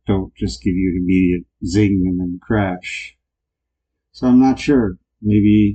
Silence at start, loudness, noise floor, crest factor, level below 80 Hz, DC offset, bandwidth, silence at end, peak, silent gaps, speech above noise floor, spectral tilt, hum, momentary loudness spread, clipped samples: 0.1 s; -17 LUFS; -80 dBFS; 14 dB; -36 dBFS; under 0.1%; 8.8 kHz; 0 s; -4 dBFS; none; 64 dB; -7.5 dB/octave; none; 12 LU; under 0.1%